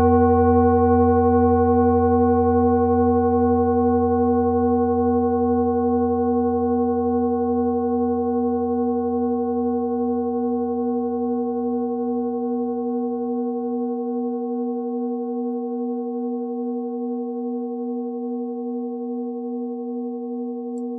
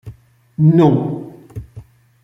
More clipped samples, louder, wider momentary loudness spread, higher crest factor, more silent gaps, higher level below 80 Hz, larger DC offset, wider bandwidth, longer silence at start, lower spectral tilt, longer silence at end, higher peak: neither; second, -21 LUFS vs -14 LUFS; second, 11 LU vs 23 LU; about the same, 16 dB vs 16 dB; neither; first, -42 dBFS vs -48 dBFS; neither; second, 2.5 kHz vs 3.9 kHz; about the same, 0 s vs 0.05 s; second, -6 dB/octave vs -10.5 dB/octave; second, 0 s vs 0.4 s; second, -6 dBFS vs -2 dBFS